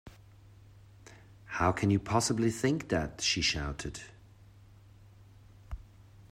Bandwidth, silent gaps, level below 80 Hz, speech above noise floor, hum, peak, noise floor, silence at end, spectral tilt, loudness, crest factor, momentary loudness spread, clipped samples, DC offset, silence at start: 15 kHz; none; -52 dBFS; 26 dB; none; -12 dBFS; -56 dBFS; 0.05 s; -4 dB/octave; -30 LUFS; 22 dB; 20 LU; under 0.1%; under 0.1%; 0.05 s